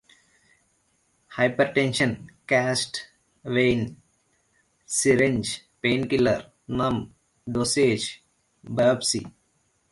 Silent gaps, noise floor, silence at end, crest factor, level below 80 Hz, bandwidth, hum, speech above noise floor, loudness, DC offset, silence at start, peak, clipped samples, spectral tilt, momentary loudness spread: none; -69 dBFS; 0.6 s; 18 dB; -54 dBFS; 11.5 kHz; none; 45 dB; -24 LUFS; under 0.1%; 1.3 s; -8 dBFS; under 0.1%; -4 dB/octave; 13 LU